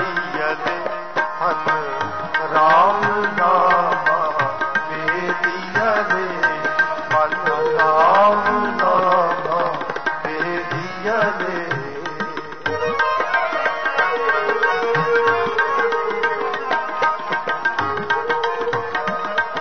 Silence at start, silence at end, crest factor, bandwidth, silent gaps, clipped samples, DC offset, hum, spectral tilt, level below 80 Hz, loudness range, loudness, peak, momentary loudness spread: 0 s; 0 s; 14 dB; 6.6 kHz; none; under 0.1%; 1%; none; -5 dB/octave; -58 dBFS; 4 LU; -19 LUFS; -6 dBFS; 8 LU